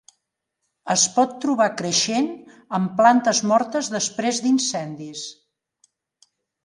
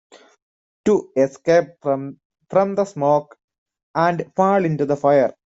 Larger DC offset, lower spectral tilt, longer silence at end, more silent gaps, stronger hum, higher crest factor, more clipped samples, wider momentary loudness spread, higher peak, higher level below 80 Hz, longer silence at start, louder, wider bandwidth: neither; second, -3 dB/octave vs -7 dB/octave; first, 1.3 s vs 0.2 s; second, none vs 2.25-2.30 s, 3.44-3.48 s, 3.58-3.66 s, 3.83-3.94 s; neither; about the same, 20 dB vs 16 dB; neither; first, 16 LU vs 7 LU; about the same, -2 dBFS vs -4 dBFS; second, -72 dBFS vs -62 dBFS; about the same, 0.85 s vs 0.85 s; about the same, -20 LUFS vs -19 LUFS; first, 11.5 kHz vs 8 kHz